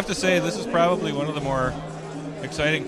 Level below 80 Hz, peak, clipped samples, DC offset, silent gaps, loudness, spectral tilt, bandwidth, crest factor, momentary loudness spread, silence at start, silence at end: -46 dBFS; -6 dBFS; under 0.1%; under 0.1%; none; -24 LUFS; -5 dB/octave; 14.5 kHz; 18 dB; 13 LU; 0 s; 0 s